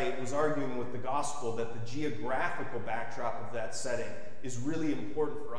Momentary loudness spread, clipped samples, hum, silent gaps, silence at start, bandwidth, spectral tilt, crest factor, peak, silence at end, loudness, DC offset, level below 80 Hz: 6 LU; under 0.1%; none; none; 0 s; 11 kHz; -5 dB/octave; 18 dB; -16 dBFS; 0 s; -36 LUFS; 3%; -62 dBFS